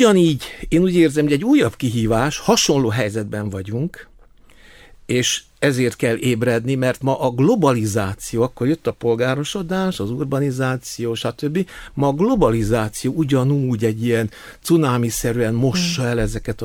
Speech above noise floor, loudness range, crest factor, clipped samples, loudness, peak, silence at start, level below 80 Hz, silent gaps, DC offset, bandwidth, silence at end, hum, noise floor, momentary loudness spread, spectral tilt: 29 dB; 4 LU; 16 dB; under 0.1%; -19 LUFS; -2 dBFS; 0 s; -40 dBFS; none; under 0.1%; 17.5 kHz; 0 s; none; -47 dBFS; 9 LU; -5.5 dB/octave